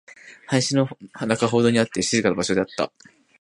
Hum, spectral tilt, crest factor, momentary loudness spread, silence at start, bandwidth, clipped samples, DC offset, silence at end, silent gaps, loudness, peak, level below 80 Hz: none; -4.5 dB/octave; 22 dB; 9 LU; 0.25 s; 11.5 kHz; under 0.1%; under 0.1%; 0.55 s; none; -22 LUFS; -2 dBFS; -58 dBFS